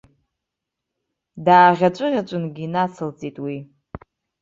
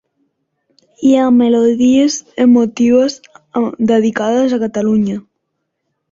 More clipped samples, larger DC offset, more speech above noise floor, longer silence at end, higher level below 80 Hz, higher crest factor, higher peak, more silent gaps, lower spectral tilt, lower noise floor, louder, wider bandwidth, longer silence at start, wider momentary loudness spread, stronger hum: neither; neither; first, 64 dB vs 60 dB; second, 0.45 s vs 0.9 s; about the same, -58 dBFS vs -56 dBFS; first, 20 dB vs 12 dB; about the same, -2 dBFS vs -2 dBFS; neither; first, -7 dB/octave vs -5.5 dB/octave; first, -83 dBFS vs -71 dBFS; second, -19 LUFS vs -13 LUFS; about the same, 7.6 kHz vs 7.6 kHz; first, 1.35 s vs 1 s; first, 18 LU vs 9 LU; neither